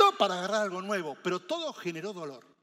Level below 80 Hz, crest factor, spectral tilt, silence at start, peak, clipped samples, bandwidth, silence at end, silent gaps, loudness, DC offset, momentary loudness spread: under -90 dBFS; 22 dB; -4 dB/octave; 0 s; -8 dBFS; under 0.1%; 16 kHz; 0.2 s; none; -31 LUFS; under 0.1%; 11 LU